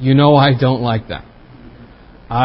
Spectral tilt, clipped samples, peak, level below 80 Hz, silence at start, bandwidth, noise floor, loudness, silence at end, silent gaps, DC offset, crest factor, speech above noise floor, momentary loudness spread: -12.5 dB/octave; under 0.1%; 0 dBFS; -42 dBFS; 0 s; 5.6 kHz; -40 dBFS; -13 LUFS; 0 s; none; under 0.1%; 14 dB; 28 dB; 18 LU